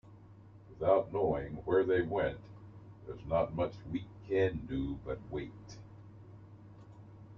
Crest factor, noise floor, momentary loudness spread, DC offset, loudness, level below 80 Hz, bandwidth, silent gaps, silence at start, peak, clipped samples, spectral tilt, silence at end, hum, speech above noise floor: 22 dB; -55 dBFS; 24 LU; under 0.1%; -34 LUFS; -56 dBFS; 6.8 kHz; none; 0.05 s; -14 dBFS; under 0.1%; -8 dB/octave; 0 s; none; 22 dB